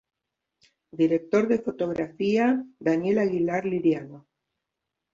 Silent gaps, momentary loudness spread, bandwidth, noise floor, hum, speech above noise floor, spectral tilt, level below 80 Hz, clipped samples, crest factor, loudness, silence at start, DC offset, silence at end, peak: none; 6 LU; 7.4 kHz; -84 dBFS; none; 60 dB; -7.5 dB/octave; -66 dBFS; under 0.1%; 16 dB; -25 LUFS; 0.95 s; under 0.1%; 0.95 s; -10 dBFS